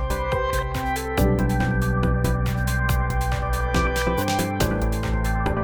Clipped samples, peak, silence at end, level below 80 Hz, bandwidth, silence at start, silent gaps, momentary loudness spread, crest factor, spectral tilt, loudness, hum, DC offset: under 0.1%; -8 dBFS; 0 s; -26 dBFS; over 20 kHz; 0 s; none; 3 LU; 14 dB; -6 dB/octave; -23 LUFS; none; under 0.1%